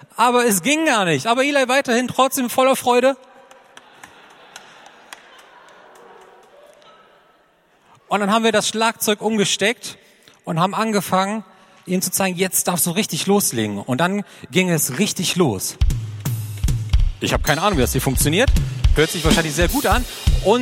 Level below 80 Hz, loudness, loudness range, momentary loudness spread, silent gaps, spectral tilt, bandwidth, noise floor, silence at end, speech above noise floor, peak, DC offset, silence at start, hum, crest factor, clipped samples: -28 dBFS; -18 LUFS; 5 LU; 8 LU; none; -4 dB/octave; 16.5 kHz; -57 dBFS; 0 s; 39 dB; 0 dBFS; under 0.1%; 0.15 s; none; 18 dB; under 0.1%